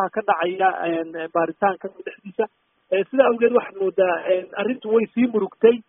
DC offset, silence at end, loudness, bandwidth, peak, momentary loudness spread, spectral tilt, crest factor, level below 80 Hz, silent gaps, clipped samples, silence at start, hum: under 0.1%; 0.1 s; -21 LUFS; 3.7 kHz; -2 dBFS; 9 LU; -0.5 dB/octave; 18 dB; -70 dBFS; none; under 0.1%; 0 s; none